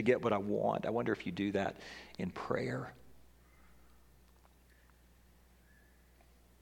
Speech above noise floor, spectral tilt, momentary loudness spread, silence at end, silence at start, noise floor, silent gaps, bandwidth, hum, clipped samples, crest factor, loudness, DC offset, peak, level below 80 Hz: 29 dB; -7 dB/octave; 12 LU; 3.4 s; 0 s; -64 dBFS; none; 18 kHz; 60 Hz at -65 dBFS; under 0.1%; 24 dB; -36 LUFS; under 0.1%; -16 dBFS; -66 dBFS